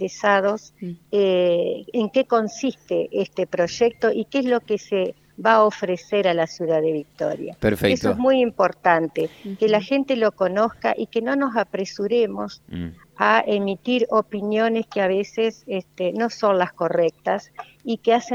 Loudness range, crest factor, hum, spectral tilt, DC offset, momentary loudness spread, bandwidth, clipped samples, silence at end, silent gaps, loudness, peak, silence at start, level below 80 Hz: 2 LU; 20 dB; none; -5.5 dB/octave; under 0.1%; 9 LU; 15.5 kHz; under 0.1%; 0 s; none; -21 LUFS; -2 dBFS; 0 s; -54 dBFS